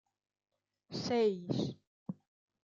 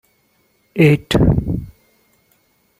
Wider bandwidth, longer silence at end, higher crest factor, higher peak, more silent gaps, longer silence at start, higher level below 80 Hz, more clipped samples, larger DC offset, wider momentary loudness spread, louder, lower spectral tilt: second, 7.6 kHz vs 15.5 kHz; second, 0.5 s vs 1.1 s; about the same, 16 dB vs 18 dB; second, -22 dBFS vs 0 dBFS; first, 1.87-2.06 s vs none; first, 0.9 s vs 0.75 s; second, -76 dBFS vs -32 dBFS; neither; neither; first, 17 LU vs 13 LU; second, -35 LUFS vs -16 LUFS; second, -6 dB/octave vs -7.5 dB/octave